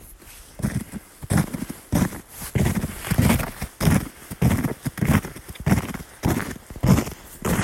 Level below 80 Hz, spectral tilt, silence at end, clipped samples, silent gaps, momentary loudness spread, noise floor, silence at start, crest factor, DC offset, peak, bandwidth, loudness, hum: -36 dBFS; -6 dB/octave; 0 s; under 0.1%; none; 14 LU; -44 dBFS; 0 s; 20 dB; under 0.1%; -2 dBFS; 16.5 kHz; -24 LUFS; none